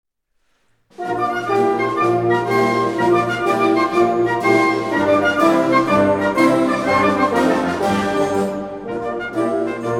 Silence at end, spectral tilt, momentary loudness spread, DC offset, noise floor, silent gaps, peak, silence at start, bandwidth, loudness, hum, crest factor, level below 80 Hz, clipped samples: 0 s; -6 dB/octave; 7 LU; under 0.1%; -65 dBFS; none; -2 dBFS; 1 s; 14.5 kHz; -17 LUFS; none; 16 dB; -52 dBFS; under 0.1%